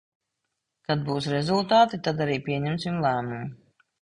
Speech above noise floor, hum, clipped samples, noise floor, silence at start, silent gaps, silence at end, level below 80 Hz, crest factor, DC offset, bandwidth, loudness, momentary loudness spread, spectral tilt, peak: 57 dB; none; under 0.1%; -81 dBFS; 0.9 s; none; 0.45 s; -60 dBFS; 18 dB; under 0.1%; 11 kHz; -25 LUFS; 14 LU; -6.5 dB/octave; -8 dBFS